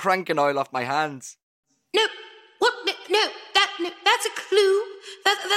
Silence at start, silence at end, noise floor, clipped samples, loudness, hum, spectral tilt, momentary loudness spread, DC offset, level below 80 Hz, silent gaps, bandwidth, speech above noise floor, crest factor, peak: 0 s; 0 s; -44 dBFS; under 0.1%; -23 LUFS; none; -2 dB/octave; 8 LU; under 0.1%; -70 dBFS; 1.43-1.63 s; 15.5 kHz; 21 dB; 20 dB; -4 dBFS